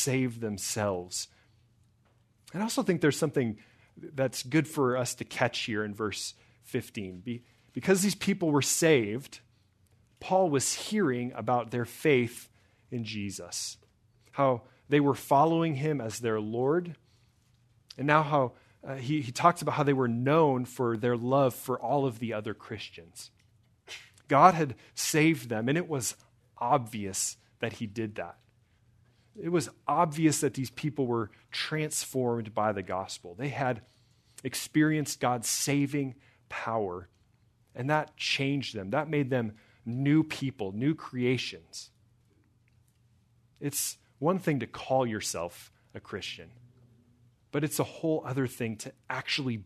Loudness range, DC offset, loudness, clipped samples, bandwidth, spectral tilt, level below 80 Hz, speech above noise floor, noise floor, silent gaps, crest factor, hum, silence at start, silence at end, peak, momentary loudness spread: 6 LU; under 0.1%; -30 LUFS; under 0.1%; 13.5 kHz; -4.5 dB/octave; -70 dBFS; 37 dB; -67 dBFS; none; 24 dB; none; 0 s; 0 s; -6 dBFS; 15 LU